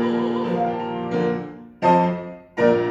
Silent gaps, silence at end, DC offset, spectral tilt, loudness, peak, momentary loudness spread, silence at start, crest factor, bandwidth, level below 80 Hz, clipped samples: none; 0 s; under 0.1%; -8 dB/octave; -22 LUFS; -4 dBFS; 12 LU; 0 s; 16 dB; 7.6 kHz; -60 dBFS; under 0.1%